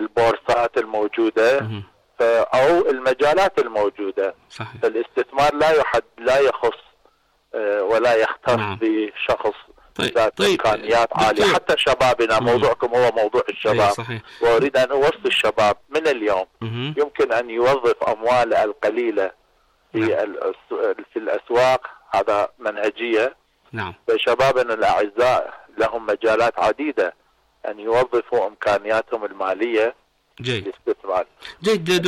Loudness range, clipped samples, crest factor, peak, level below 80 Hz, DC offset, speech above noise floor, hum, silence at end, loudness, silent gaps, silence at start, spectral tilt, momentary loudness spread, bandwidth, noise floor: 4 LU; under 0.1%; 10 dB; -10 dBFS; -52 dBFS; under 0.1%; 41 dB; none; 0 s; -20 LUFS; none; 0 s; -4.5 dB/octave; 10 LU; 15 kHz; -61 dBFS